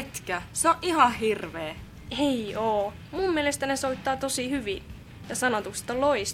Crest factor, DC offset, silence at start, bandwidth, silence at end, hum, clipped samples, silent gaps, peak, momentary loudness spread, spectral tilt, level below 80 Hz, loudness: 22 dB; under 0.1%; 0 s; 17 kHz; 0 s; none; under 0.1%; none; -6 dBFS; 14 LU; -3.5 dB/octave; -50 dBFS; -27 LUFS